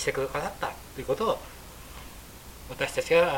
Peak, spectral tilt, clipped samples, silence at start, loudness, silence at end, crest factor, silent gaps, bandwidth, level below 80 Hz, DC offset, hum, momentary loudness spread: -8 dBFS; -4 dB/octave; under 0.1%; 0 s; -29 LUFS; 0 s; 20 dB; none; 17 kHz; -48 dBFS; under 0.1%; none; 19 LU